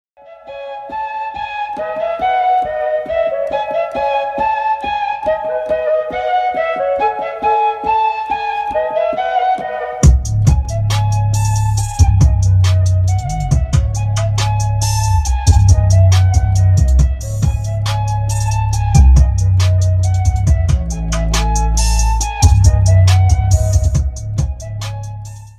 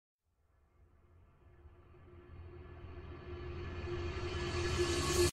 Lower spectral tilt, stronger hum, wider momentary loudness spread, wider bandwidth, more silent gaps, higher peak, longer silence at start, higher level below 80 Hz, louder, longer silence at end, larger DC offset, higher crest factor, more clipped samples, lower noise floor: about the same, -5.5 dB/octave vs -4.5 dB/octave; neither; second, 10 LU vs 24 LU; second, 13 kHz vs 15 kHz; neither; first, 0 dBFS vs -18 dBFS; second, 0.25 s vs 0.8 s; first, -18 dBFS vs -50 dBFS; first, -15 LUFS vs -38 LUFS; about the same, 0.1 s vs 0 s; neither; second, 14 dB vs 22 dB; neither; second, -36 dBFS vs -74 dBFS